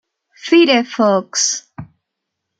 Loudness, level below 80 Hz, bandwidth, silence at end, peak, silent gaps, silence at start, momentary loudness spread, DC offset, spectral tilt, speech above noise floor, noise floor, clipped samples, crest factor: -14 LUFS; -62 dBFS; 9.2 kHz; 0.75 s; -2 dBFS; none; 0.45 s; 11 LU; under 0.1%; -2.5 dB/octave; 63 dB; -78 dBFS; under 0.1%; 16 dB